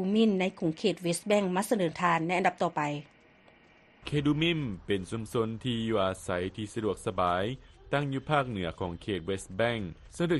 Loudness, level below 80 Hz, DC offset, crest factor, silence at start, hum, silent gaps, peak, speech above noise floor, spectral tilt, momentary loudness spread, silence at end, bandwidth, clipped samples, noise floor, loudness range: -30 LUFS; -56 dBFS; under 0.1%; 18 dB; 0 s; none; none; -12 dBFS; 30 dB; -5.5 dB/octave; 8 LU; 0 s; 12 kHz; under 0.1%; -60 dBFS; 3 LU